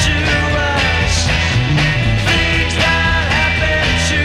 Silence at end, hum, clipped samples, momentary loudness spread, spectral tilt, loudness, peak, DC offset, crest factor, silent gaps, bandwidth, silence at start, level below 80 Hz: 0 s; none; under 0.1%; 1 LU; -4 dB/octave; -14 LUFS; -4 dBFS; under 0.1%; 10 dB; none; 12.5 kHz; 0 s; -22 dBFS